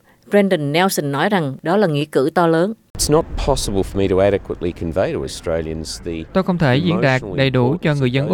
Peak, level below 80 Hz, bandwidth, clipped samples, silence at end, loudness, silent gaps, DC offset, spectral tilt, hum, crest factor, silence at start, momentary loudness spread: -2 dBFS; -34 dBFS; 18.5 kHz; under 0.1%; 0 s; -18 LUFS; 2.90-2.94 s; under 0.1%; -5.5 dB/octave; none; 16 dB; 0.3 s; 7 LU